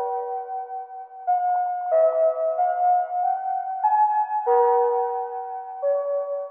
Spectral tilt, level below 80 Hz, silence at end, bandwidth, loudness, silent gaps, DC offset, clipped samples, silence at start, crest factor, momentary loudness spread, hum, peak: 1 dB/octave; under -90 dBFS; 0 s; 3 kHz; -23 LUFS; none; under 0.1%; under 0.1%; 0 s; 14 dB; 12 LU; none; -10 dBFS